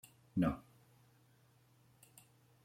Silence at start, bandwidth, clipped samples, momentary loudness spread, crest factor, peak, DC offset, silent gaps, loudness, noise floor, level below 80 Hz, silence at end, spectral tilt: 0.35 s; 16.5 kHz; under 0.1%; 26 LU; 22 dB; -24 dBFS; under 0.1%; none; -39 LUFS; -69 dBFS; -64 dBFS; 2.05 s; -7.5 dB/octave